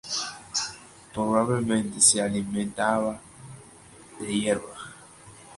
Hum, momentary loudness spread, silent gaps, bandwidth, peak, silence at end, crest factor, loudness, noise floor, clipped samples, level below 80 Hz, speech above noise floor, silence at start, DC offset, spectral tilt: none; 24 LU; none; 11.5 kHz; -6 dBFS; 0 s; 22 dB; -25 LUFS; -50 dBFS; under 0.1%; -58 dBFS; 25 dB; 0.05 s; under 0.1%; -3 dB/octave